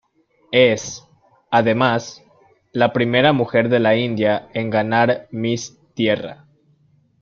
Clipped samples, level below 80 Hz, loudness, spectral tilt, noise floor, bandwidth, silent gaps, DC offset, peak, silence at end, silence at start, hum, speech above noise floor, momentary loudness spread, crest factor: under 0.1%; -58 dBFS; -18 LUFS; -5.5 dB/octave; -59 dBFS; 7.6 kHz; none; under 0.1%; -2 dBFS; 0.9 s; 0.5 s; none; 42 dB; 12 LU; 18 dB